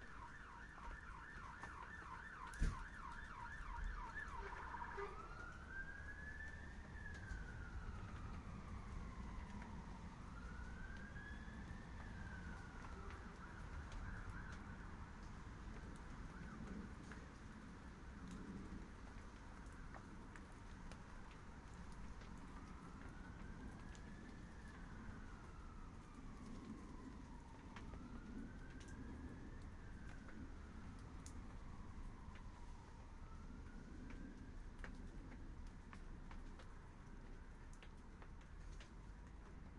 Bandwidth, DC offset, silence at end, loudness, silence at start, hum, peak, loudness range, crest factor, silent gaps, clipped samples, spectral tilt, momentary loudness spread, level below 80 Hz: 11 kHz; under 0.1%; 0 s; -55 LUFS; 0 s; none; -28 dBFS; 6 LU; 24 dB; none; under 0.1%; -6 dB/octave; 7 LU; -56 dBFS